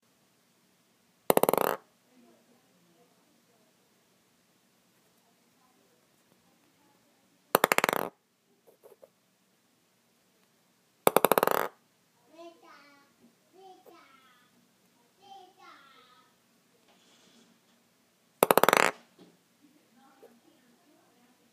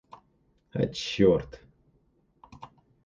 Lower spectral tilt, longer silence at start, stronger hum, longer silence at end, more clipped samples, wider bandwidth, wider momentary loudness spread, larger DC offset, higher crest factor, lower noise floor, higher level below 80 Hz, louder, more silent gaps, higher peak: second, -2.5 dB/octave vs -6 dB/octave; first, 1.3 s vs 0.75 s; neither; first, 2.6 s vs 0.4 s; neither; first, 15.5 kHz vs 7.6 kHz; first, 30 LU vs 26 LU; neither; first, 34 dB vs 22 dB; about the same, -71 dBFS vs -68 dBFS; second, -76 dBFS vs -54 dBFS; about the same, -26 LUFS vs -27 LUFS; neither; first, 0 dBFS vs -10 dBFS